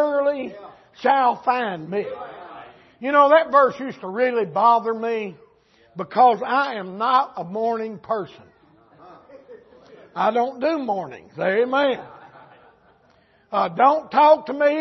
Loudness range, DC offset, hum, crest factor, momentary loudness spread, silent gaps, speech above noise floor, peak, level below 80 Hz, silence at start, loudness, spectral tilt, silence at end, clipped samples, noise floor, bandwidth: 7 LU; under 0.1%; none; 18 dB; 18 LU; none; 38 dB; -4 dBFS; -70 dBFS; 0 s; -20 LUFS; -6.5 dB/octave; 0 s; under 0.1%; -58 dBFS; 6.2 kHz